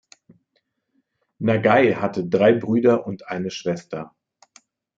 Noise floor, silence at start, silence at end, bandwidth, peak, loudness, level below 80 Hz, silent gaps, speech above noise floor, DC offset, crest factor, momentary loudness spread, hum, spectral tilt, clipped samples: -72 dBFS; 1.4 s; 0.9 s; 7.6 kHz; -4 dBFS; -20 LUFS; -66 dBFS; none; 52 dB; under 0.1%; 20 dB; 14 LU; none; -7 dB/octave; under 0.1%